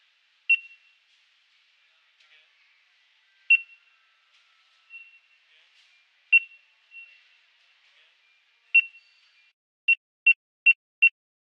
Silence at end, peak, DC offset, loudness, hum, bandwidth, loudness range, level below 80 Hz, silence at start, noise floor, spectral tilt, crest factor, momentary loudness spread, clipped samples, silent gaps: 0.4 s; -10 dBFS; under 0.1%; -21 LUFS; none; 8.6 kHz; 6 LU; under -90 dBFS; 0.5 s; -65 dBFS; 7 dB/octave; 20 dB; 26 LU; under 0.1%; 9.53-9.88 s, 9.97-10.26 s, 10.36-10.66 s, 10.75-11.02 s